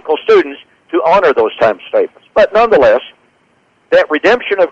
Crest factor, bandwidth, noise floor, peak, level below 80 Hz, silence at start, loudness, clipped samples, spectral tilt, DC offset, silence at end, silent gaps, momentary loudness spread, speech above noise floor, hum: 10 dB; 7.8 kHz; -54 dBFS; -2 dBFS; -46 dBFS; 0.05 s; -11 LUFS; under 0.1%; -5 dB/octave; under 0.1%; 0 s; none; 7 LU; 44 dB; none